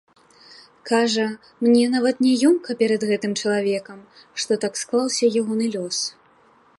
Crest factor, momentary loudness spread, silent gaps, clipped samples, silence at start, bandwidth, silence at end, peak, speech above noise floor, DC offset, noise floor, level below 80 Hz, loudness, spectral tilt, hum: 16 dB; 9 LU; none; under 0.1%; 0.85 s; 11.5 kHz; 0.7 s; -6 dBFS; 35 dB; under 0.1%; -56 dBFS; -72 dBFS; -21 LUFS; -3.5 dB/octave; none